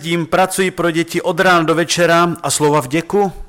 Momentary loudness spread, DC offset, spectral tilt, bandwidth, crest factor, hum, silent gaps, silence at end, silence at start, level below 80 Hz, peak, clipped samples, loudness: 5 LU; under 0.1%; -4 dB/octave; 17 kHz; 10 dB; none; none; 0 s; 0 s; -42 dBFS; -4 dBFS; under 0.1%; -14 LUFS